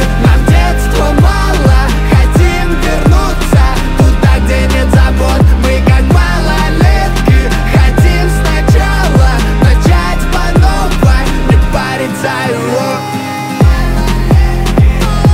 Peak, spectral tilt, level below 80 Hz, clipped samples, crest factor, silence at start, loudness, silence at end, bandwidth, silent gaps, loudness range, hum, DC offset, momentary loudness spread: 0 dBFS; -6 dB/octave; -10 dBFS; under 0.1%; 8 dB; 0 s; -10 LUFS; 0 s; 16 kHz; none; 3 LU; none; under 0.1%; 5 LU